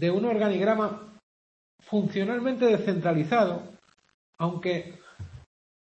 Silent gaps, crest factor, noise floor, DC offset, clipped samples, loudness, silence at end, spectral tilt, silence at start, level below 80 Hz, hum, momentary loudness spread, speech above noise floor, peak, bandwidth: 1.23-1.78 s, 4.14-4.33 s; 18 dB; under -90 dBFS; under 0.1%; under 0.1%; -26 LUFS; 0.55 s; -7.5 dB/octave; 0 s; -66 dBFS; none; 21 LU; over 64 dB; -10 dBFS; 8.4 kHz